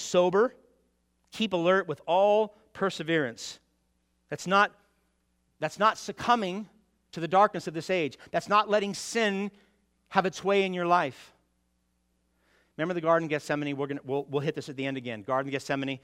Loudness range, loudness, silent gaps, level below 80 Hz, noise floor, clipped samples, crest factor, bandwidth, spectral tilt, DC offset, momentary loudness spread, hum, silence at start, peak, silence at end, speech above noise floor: 4 LU; -28 LUFS; none; -72 dBFS; -73 dBFS; under 0.1%; 22 dB; 15.5 kHz; -4.5 dB/octave; under 0.1%; 12 LU; none; 0 s; -6 dBFS; 0.05 s; 46 dB